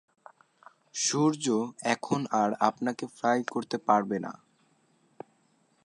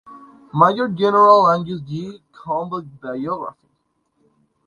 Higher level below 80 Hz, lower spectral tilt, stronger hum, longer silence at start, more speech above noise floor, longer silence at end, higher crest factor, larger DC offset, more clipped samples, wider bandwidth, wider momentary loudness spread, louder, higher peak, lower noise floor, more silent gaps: second, -78 dBFS vs -62 dBFS; second, -4 dB/octave vs -7.5 dB/octave; neither; first, 0.95 s vs 0.05 s; second, 40 dB vs 51 dB; first, 1.5 s vs 1.15 s; about the same, 24 dB vs 20 dB; neither; neither; first, 11.5 kHz vs 9.8 kHz; second, 16 LU vs 19 LU; second, -28 LUFS vs -17 LUFS; second, -6 dBFS vs 0 dBFS; about the same, -68 dBFS vs -68 dBFS; neither